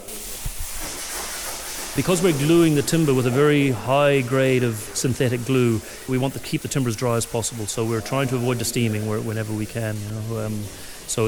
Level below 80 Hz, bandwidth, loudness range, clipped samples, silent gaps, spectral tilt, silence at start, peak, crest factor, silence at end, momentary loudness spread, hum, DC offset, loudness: -44 dBFS; over 20 kHz; 6 LU; under 0.1%; none; -5 dB/octave; 0 s; -6 dBFS; 16 dB; 0 s; 11 LU; none; under 0.1%; -22 LUFS